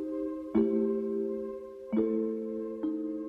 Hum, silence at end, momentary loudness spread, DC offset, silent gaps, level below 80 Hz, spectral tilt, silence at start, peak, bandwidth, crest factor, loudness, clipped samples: none; 0 s; 8 LU; under 0.1%; none; -64 dBFS; -10 dB/octave; 0 s; -16 dBFS; 3.8 kHz; 16 dB; -32 LUFS; under 0.1%